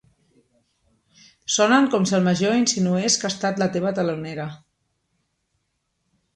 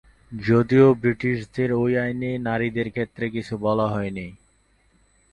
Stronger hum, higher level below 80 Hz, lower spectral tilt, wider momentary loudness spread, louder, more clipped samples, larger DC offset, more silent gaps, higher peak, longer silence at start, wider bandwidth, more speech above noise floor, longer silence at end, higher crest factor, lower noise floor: neither; second, -64 dBFS vs -52 dBFS; second, -4 dB/octave vs -8.5 dB/octave; about the same, 14 LU vs 14 LU; about the same, -20 LUFS vs -22 LUFS; neither; neither; neither; about the same, -4 dBFS vs -4 dBFS; first, 1.5 s vs 0.3 s; first, 11 kHz vs 9.2 kHz; first, 53 dB vs 40 dB; first, 1.8 s vs 1 s; about the same, 18 dB vs 18 dB; first, -74 dBFS vs -62 dBFS